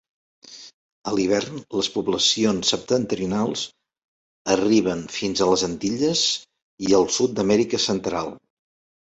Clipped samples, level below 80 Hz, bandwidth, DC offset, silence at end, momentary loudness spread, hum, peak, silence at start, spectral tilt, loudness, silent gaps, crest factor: under 0.1%; -56 dBFS; 8.2 kHz; under 0.1%; 0.7 s; 11 LU; none; -4 dBFS; 0.45 s; -3.5 dB/octave; -22 LUFS; 0.74-1.02 s, 4.04-4.45 s, 6.62-6.78 s; 18 dB